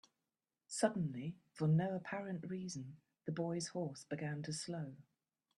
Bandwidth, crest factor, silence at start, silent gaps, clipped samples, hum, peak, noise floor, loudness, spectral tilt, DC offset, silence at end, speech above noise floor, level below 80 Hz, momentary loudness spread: 12 kHz; 22 dB; 0.7 s; none; under 0.1%; none; -20 dBFS; under -90 dBFS; -41 LUFS; -6 dB/octave; under 0.1%; 0.55 s; over 50 dB; -80 dBFS; 13 LU